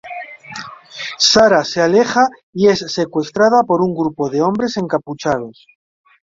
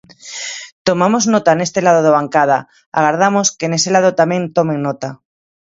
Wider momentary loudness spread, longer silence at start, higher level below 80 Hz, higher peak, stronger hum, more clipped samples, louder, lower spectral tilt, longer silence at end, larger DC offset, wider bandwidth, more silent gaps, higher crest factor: first, 19 LU vs 12 LU; second, 0.05 s vs 0.25 s; first, -54 dBFS vs -60 dBFS; about the same, 0 dBFS vs 0 dBFS; neither; neither; about the same, -15 LUFS vs -14 LUFS; about the same, -4 dB/octave vs -4 dB/octave; first, 0.75 s vs 0.5 s; neither; about the same, 7.8 kHz vs 8 kHz; second, 2.43-2.53 s vs 0.72-0.85 s, 2.86-2.92 s; about the same, 16 dB vs 14 dB